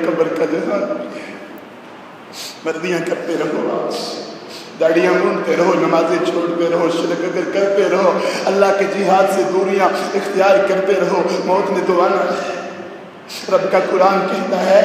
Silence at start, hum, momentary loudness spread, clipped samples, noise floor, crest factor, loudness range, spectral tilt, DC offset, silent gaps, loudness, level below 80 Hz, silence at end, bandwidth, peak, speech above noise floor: 0 s; none; 17 LU; under 0.1%; -36 dBFS; 16 dB; 8 LU; -5 dB/octave; under 0.1%; none; -16 LUFS; -70 dBFS; 0 s; 15.5 kHz; 0 dBFS; 21 dB